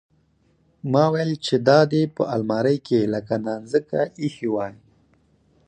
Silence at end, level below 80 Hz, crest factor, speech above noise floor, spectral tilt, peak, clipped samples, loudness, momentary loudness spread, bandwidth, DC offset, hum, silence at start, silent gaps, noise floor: 0.95 s; -62 dBFS; 20 dB; 41 dB; -7 dB/octave; -2 dBFS; under 0.1%; -22 LUFS; 9 LU; 9.6 kHz; under 0.1%; none; 0.85 s; none; -62 dBFS